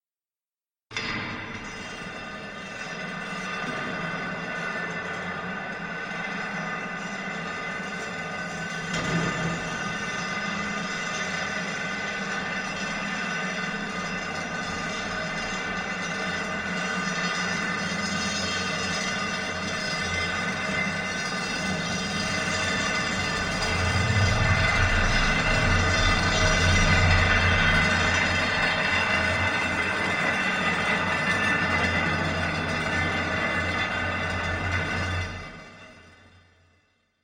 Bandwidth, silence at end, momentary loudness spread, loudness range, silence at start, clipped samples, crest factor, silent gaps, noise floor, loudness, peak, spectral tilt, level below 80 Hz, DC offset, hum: 16 kHz; 1.1 s; 10 LU; 10 LU; 0.9 s; under 0.1%; 18 dB; none; under -90 dBFS; -26 LUFS; -8 dBFS; -4 dB/octave; -38 dBFS; under 0.1%; none